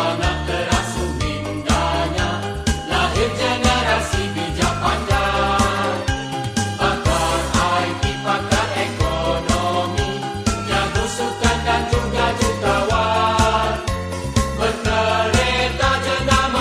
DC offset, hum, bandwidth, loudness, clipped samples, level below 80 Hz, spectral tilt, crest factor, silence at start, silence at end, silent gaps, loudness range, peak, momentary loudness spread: under 0.1%; none; 14 kHz; -19 LUFS; under 0.1%; -28 dBFS; -4.5 dB/octave; 18 dB; 0 s; 0 s; none; 2 LU; -2 dBFS; 6 LU